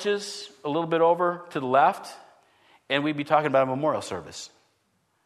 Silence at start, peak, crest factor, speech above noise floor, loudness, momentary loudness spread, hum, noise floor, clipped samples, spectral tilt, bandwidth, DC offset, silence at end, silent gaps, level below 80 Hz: 0 s; -6 dBFS; 20 dB; 46 dB; -25 LUFS; 16 LU; none; -70 dBFS; under 0.1%; -5 dB/octave; 13.5 kHz; under 0.1%; 0.8 s; none; -72 dBFS